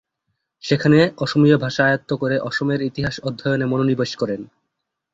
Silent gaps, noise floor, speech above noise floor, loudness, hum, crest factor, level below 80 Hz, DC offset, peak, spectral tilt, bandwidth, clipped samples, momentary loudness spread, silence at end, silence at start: none; -78 dBFS; 59 dB; -19 LUFS; none; 18 dB; -52 dBFS; under 0.1%; -2 dBFS; -6.5 dB/octave; 8 kHz; under 0.1%; 10 LU; 0.7 s; 0.65 s